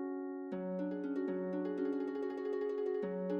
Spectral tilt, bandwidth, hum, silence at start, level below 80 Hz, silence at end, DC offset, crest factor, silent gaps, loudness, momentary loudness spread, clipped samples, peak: -9.5 dB/octave; 6.4 kHz; none; 0 s; -86 dBFS; 0 s; under 0.1%; 12 dB; none; -39 LUFS; 4 LU; under 0.1%; -26 dBFS